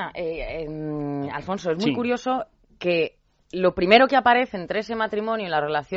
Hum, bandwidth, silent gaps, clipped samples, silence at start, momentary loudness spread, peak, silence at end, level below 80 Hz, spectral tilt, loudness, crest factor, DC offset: none; 8 kHz; none; under 0.1%; 0 s; 14 LU; 0 dBFS; 0 s; -50 dBFS; -3 dB/octave; -23 LUFS; 24 dB; under 0.1%